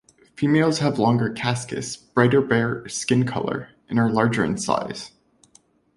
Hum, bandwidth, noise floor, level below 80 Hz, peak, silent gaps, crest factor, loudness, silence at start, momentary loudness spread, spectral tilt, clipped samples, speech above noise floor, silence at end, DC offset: none; 11.5 kHz; -58 dBFS; -56 dBFS; -2 dBFS; none; 20 dB; -22 LUFS; 0.4 s; 11 LU; -5.5 dB/octave; under 0.1%; 37 dB; 0.9 s; under 0.1%